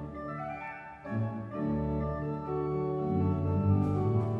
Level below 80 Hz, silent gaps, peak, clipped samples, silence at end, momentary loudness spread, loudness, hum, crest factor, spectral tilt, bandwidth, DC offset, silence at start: -48 dBFS; none; -14 dBFS; under 0.1%; 0 s; 11 LU; -32 LUFS; none; 16 dB; -11 dB/octave; 4.7 kHz; under 0.1%; 0 s